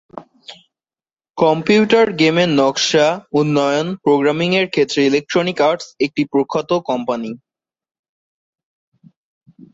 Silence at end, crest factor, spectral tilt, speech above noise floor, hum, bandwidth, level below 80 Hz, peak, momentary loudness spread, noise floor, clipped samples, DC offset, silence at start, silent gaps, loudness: 2.35 s; 16 dB; -5 dB/octave; over 74 dB; none; 7.8 kHz; -60 dBFS; -2 dBFS; 8 LU; under -90 dBFS; under 0.1%; under 0.1%; 0.15 s; 1.30-1.34 s; -16 LUFS